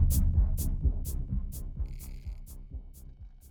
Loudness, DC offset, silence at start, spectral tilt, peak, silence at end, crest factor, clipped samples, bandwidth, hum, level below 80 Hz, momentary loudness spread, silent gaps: -33 LUFS; under 0.1%; 0 s; -6.5 dB/octave; -14 dBFS; 0 s; 16 dB; under 0.1%; 19.5 kHz; none; -32 dBFS; 22 LU; none